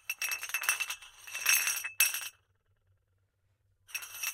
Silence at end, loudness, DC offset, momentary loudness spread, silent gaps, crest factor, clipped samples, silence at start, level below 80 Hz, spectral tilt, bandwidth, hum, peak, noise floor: 0 s; -30 LUFS; under 0.1%; 15 LU; none; 28 dB; under 0.1%; 0.1 s; -78 dBFS; 4 dB/octave; 17 kHz; none; -8 dBFS; -75 dBFS